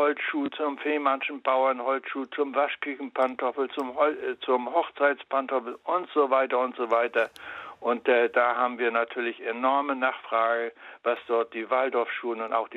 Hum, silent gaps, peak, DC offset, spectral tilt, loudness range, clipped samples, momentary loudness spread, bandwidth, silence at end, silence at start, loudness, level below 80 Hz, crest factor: none; none; -8 dBFS; under 0.1%; -5 dB/octave; 2 LU; under 0.1%; 7 LU; 8.2 kHz; 0 s; 0 s; -27 LUFS; -78 dBFS; 18 dB